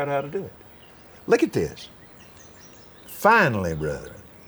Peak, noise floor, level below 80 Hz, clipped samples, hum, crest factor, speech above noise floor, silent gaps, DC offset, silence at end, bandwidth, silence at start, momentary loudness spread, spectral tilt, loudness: -4 dBFS; -48 dBFS; -52 dBFS; under 0.1%; none; 22 dB; 26 dB; none; under 0.1%; 0.25 s; over 20 kHz; 0 s; 25 LU; -5.5 dB/octave; -22 LUFS